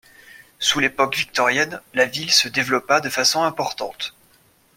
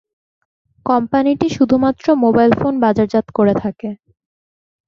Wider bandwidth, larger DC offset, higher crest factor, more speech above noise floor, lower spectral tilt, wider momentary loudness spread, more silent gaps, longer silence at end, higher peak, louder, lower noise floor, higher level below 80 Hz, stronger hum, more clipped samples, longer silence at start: first, 16.5 kHz vs 7.4 kHz; neither; about the same, 20 dB vs 16 dB; second, 36 dB vs over 76 dB; second, -1.5 dB/octave vs -7.5 dB/octave; about the same, 11 LU vs 13 LU; neither; second, 0.65 s vs 0.95 s; about the same, -2 dBFS vs 0 dBFS; second, -19 LUFS vs -15 LUFS; second, -57 dBFS vs under -90 dBFS; second, -60 dBFS vs -48 dBFS; neither; neither; second, 0.35 s vs 0.85 s